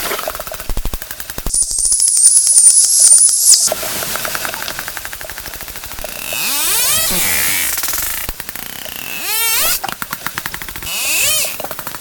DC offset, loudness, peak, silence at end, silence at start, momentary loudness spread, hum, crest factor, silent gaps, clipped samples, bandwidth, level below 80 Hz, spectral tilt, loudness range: under 0.1%; -11 LUFS; 0 dBFS; 0 s; 0 s; 19 LU; none; 16 dB; none; 0.1%; over 20 kHz; -34 dBFS; 1 dB/octave; 9 LU